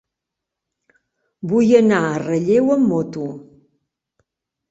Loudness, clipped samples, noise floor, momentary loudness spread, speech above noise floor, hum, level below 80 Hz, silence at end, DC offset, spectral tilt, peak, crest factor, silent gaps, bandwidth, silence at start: -17 LUFS; under 0.1%; -83 dBFS; 17 LU; 67 dB; none; -60 dBFS; 1.3 s; under 0.1%; -7 dB/octave; -2 dBFS; 18 dB; none; 8 kHz; 1.45 s